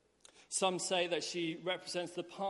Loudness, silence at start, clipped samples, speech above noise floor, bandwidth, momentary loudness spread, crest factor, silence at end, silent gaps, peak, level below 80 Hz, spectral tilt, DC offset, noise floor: -36 LUFS; 0.35 s; under 0.1%; 27 dB; 11.5 kHz; 7 LU; 18 dB; 0 s; none; -20 dBFS; -82 dBFS; -2.5 dB/octave; under 0.1%; -64 dBFS